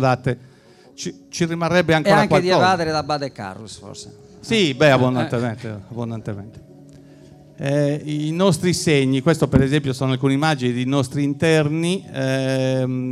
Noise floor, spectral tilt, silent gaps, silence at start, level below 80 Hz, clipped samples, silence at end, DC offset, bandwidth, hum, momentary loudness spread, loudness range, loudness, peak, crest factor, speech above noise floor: -45 dBFS; -5.5 dB/octave; none; 0 s; -46 dBFS; under 0.1%; 0 s; under 0.1%; 14.5 kHz; none; 17 LU; 4 LU; -19 LUFS; -2 dBFS; 16 dB; 26 dB